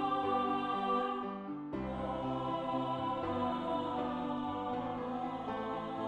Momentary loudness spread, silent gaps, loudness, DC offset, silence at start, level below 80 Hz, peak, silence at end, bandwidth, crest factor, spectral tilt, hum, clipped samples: 6 LU; none; -37 LUFS; under 0.1%; 0 s; -60 dBFS; -22 dBFS; 0 s; 8.8 kHz; 14 dB; -7.5 dB/octave; none; under 0.1%